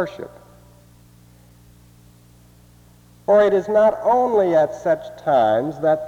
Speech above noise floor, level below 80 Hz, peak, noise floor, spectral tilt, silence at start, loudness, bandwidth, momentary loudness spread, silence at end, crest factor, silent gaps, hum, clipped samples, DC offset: 32 dB; -56 dBFS; -6 dBFS; -50 dBFS; -6.5 dB/octave; 0 s; -18 LUFS; 8.8 kHz; 12 LU; 0 s; 16 dB; none; 60 Hz at -65 dBFS; under 0.1%; under 0.1%